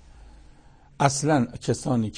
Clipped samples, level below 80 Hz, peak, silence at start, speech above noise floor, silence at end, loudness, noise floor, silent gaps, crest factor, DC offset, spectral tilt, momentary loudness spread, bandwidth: under 0.1%; -50 dBFS; -6 dBFS; 0.2 s; 28 dB; 0 s; -24 LUFS; -51 dBFS; none; 20 dB; under 0.1%; -5.5 dB/octave; 5 LU; 9.8 kHz